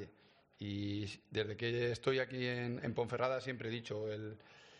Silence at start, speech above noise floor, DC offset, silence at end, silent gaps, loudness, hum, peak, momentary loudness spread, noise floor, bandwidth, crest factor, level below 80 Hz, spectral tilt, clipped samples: 0 s; 29 dB; under 0.1%; 0 s; none; -39 LUFS; none; -20 dBFS; 10 LU; -68 dBFS; 9.4 kHz; 20 dB; -72 dBFS; -6 dB/octave; under 0.1%